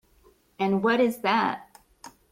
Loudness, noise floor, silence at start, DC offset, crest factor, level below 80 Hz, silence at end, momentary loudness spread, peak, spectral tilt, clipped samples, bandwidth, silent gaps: -25 LUFS; -60 dBFS; 0.6 s; under 0.1%; 16 dB; -66 dBFS; 0.25 s; 7 LU; -12 dBFS; -6 dB/octave; under 0.1%; 16 kHz; none